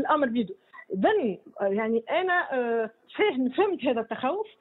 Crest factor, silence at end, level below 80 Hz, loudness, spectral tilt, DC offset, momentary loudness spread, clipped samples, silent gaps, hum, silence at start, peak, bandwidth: 16 dB; 0.15 s; -72 dBFS; -27 LUFS; -9 dB/octave; under 0.1%; 7 LU; under 0.1%; none; none; 0 s; -10 dBFS; 4.1 kHz